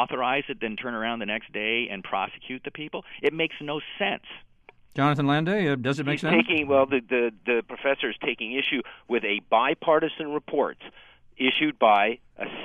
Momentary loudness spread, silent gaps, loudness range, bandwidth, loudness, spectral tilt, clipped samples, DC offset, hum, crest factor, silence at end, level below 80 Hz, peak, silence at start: 13 LU; none; 5 LU; 10.5 kHz; -25 LUFS; -6.5 dB/octave; under 0.1%; under 0.1%; none; 20 dB; 0 s; -62 dBFS; -6 dBFS; 0 s